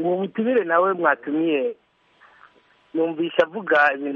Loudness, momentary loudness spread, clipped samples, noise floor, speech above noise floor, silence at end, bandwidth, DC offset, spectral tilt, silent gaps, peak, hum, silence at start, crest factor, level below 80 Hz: -21 LUFS; 7 LU; under 0.1%; -56 dBFS; 35 dB; 0 s; 6.8 kHz; under 0.1%; -7 dB/octave; none; -2 dBFS; none; 0 s; 20 dB; -72 dBFS